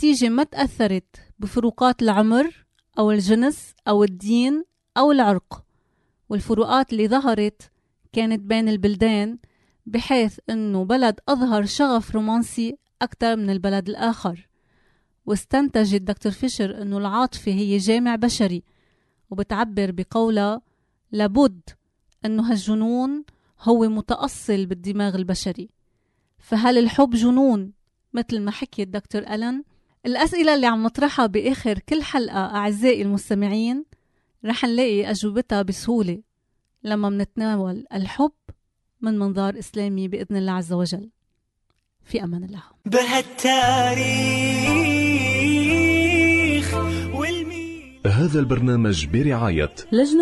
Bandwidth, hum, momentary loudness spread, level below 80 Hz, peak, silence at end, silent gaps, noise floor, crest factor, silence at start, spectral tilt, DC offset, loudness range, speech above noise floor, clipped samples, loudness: 12 kHz; none; 11 LU; -46 dBFS; -4 dBFS; 0 s; none; -72 dBFS; 16 dB; 0 s; -5.5 dB/octave; under 0.1%; 6 LU; 51 dB; under 0.1%; -21 LUFS